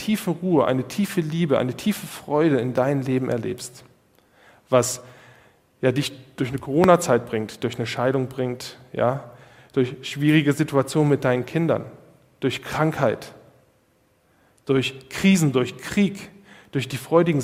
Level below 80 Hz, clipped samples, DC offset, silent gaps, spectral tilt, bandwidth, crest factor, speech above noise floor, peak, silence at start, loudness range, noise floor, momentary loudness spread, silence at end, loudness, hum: -58 dBFS; under 0.1%; under 0.1%; none; -6 dB/octave; 16 kHz; 22 dB; 41 dB; 0 dBFS; 0 s; 4 LU; -62 dBFS; 12 LU; 0 s; -23 LUFS; none